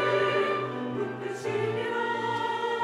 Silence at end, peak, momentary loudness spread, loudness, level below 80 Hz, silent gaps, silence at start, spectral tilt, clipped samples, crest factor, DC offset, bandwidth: 0 s; -14 dBFS; 7 LU; -29 LUFS; -74 dBFS; none; 0 s; -5.5 dB/octave; under 0.1%; 14 dB; under 0.1%; 11.5 kHz